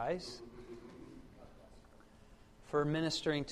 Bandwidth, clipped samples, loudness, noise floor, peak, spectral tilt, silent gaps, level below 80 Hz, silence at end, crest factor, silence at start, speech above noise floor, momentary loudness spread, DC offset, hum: 13.5 kHz; under 0.1%; -37 LUFS; -60 dBFS; -22 dBFS; -5 dB/octave; none; -62 dBFS; 0 s; 18 dB; 0 s; 24 dB; 24 LU; under 0.1%; none